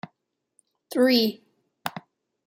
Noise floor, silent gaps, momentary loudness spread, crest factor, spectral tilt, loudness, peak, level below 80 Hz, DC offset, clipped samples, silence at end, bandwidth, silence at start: -77 dBFS; none; 25 LU; 18 dB; -4.5 dB/octave; -24 LUFS; -8 dBFS; -80 dBFS; under 0.1%; under 0.1%; 0.45 s; 16 kHz; 0.9 s